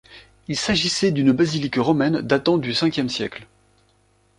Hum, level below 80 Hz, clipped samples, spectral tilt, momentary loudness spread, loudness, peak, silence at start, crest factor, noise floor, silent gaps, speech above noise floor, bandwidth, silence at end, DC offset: 50 Hz at -50 dBFS; -52 dBFS; under 0.1%; -5 dB/octave; 10 LU; -20 LUFS; -2 dBFS; 0.1 s; 18 dB; -61 dBFS; none; 41 dB; 11 kHz; 0.95 s; under 0.1%